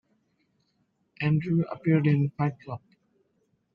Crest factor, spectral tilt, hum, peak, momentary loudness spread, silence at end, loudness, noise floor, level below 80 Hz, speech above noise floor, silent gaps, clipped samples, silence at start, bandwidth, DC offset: 18 dB; -10.5 dB/octave; none; -10 dBFS; 18 LU; 0.95 s; -26 LUFS; -73 dBFS; -66 dBFS; 47 dB; none; under 0.1%; 1.2 s; 5.2 kHz; under 0.1%